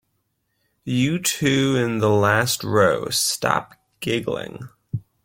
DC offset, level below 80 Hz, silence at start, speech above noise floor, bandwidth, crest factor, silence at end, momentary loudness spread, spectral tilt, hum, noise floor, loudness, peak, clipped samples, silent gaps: under 0.1%; -56 dBFS; 0.85 s; 51 dB; 16.5 kHz; 20 dB; 0.25 s; 15 LU; -4 dB/octave; none; -72 dBFS; -20 LUFS; -2 dBFS; under 0.1%; none